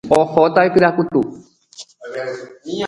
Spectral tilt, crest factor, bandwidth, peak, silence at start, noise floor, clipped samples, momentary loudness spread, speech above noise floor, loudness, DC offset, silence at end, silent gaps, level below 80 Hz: -6 dB/octave; 18 dB; 11.5 kHz; 0 dBFS; 0.05 s; -42 dBFS; under 0.1%; 18 LU; 26 dB; -16 LUFS; under 0.1%; 0 s; none; -54 dBFS